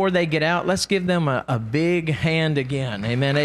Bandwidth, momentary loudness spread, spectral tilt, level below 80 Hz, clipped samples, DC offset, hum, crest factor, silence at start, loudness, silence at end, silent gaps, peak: 13 kHz; 4 LU; -5.5 dB/octave; -50 dBFS; under 0.1%; under 0.1%; none; 14 dB; 0 s; -22 LUFS; 0 s; none; -6 dBFS